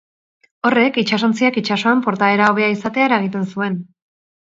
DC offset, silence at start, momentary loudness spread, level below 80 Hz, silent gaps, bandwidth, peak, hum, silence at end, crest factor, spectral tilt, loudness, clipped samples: under 0.1%; 0.65 s; 8 LU; -64 dBFS; none; 7.8 kHz; 0 dBFS; none; 0.7 s; 18 dB; -5.5 dB/octave; -16 LUFS; under 0.1%